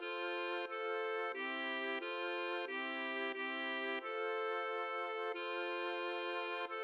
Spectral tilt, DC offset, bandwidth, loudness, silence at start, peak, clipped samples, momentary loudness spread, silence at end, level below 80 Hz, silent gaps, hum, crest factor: -2.5 dB/octave; under 0.1%; 10 kHz; -40 LUFS; 0 s; -28 dBFS; under 0.1%; 2 LU; 0 s; under -90 dBFS; none; none; 12 dB